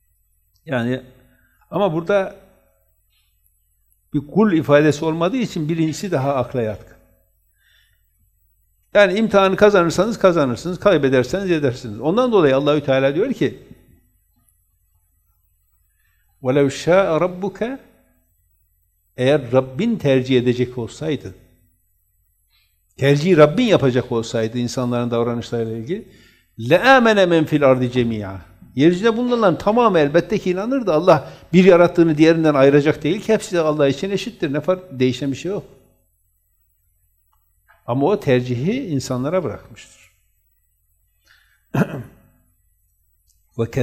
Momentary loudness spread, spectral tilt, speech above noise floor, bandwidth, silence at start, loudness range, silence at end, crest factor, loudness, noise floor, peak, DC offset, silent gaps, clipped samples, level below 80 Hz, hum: 13 LU; -6.5 dB/octave; 47 dB; 15 kHz; 0.65 s; 11 LU; 0 s; 18 dB; -17 LUFS; -64 dBFS; 0 dBFS; under 0.1%; none; under 0.1%; -52 dBFS; none